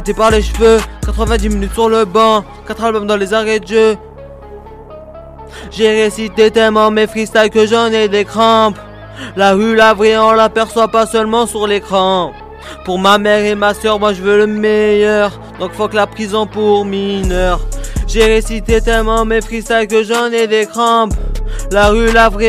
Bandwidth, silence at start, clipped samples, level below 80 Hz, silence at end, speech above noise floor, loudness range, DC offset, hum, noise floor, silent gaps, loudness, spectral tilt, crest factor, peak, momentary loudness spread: 14.5 kHz; 0 s; under 0.1%; -24 dBFS; 0 s; 20 dB; 4 LU; under 0.1%; none; -32 dBFS; none; -12 LUFS; -4.5 dB/octave; 12 dB; 0 dBFS; 12 LU